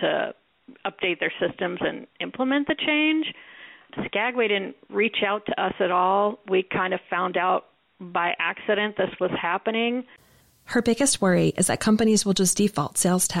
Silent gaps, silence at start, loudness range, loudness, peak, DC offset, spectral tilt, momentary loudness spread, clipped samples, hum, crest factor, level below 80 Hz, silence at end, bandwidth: none; 0 s; 3 LU; -24 LUFS; -10 dBFS; under 0.1%; -3.5 dB/octave; 10 LU; under 0.1%; none; 16 dB; -58 dBFS; 0 s; 16 kHz